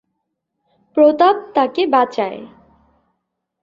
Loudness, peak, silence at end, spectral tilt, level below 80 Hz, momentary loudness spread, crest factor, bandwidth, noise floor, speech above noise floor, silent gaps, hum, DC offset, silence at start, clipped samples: -16 LUFS; -2 dBFS; 1.15 s; -5.5 dB/octave; -64 dBFS; 13 LU; 16 dB; 7.4 kHz; -75 dBFS; 60 dB; none; none; under 0.1%; 0.95 s; under 0.1%